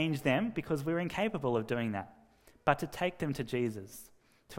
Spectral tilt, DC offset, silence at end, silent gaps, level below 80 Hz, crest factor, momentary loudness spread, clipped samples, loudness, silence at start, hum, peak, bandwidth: -6 dB/octave; under 0.1%; 0 s; none; -62 dBFS; 24 dB; 12 LU; under 0.1%; -34 LUFS; 0 s; none; -10 dBFS; 16 kHz